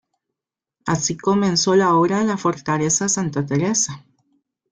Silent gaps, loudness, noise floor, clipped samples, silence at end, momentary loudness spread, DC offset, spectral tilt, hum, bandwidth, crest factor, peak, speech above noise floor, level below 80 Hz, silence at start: none; -19 LUFS; -85 dBFS; under 0.1%; 0.75 s; 8 LU; under 0.1%; -4 dB/octave; none; 10 kHz; 14 dB; -6 dBFS; 67 dB; -58 dBFS; 0.85 s